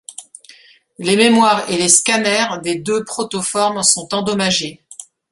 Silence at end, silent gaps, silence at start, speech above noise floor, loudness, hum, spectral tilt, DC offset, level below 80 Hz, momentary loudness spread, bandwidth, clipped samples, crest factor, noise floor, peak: 0.3 s; none; 0.1 s; 30 dB; -15 LUFS; none; -2.5 dB/octave; under 0.1%; -58 dBFS; 20 LU; 12.5 kHz; under 0.1%; 18 dB; -46 dBFS; 0 dBFS